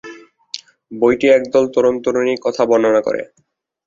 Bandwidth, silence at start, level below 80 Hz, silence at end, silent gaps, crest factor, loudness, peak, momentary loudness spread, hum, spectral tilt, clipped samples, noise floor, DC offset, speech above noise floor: 7.6 kHz; 0.05 s; -56 dBFS; 0.6 s; none; 16 dB; -15 LUFS; -2 dBFS; 18 LU; none; -5 dB/octave; under 0.1%; -38 dBFS; under 0.1%; 23 dB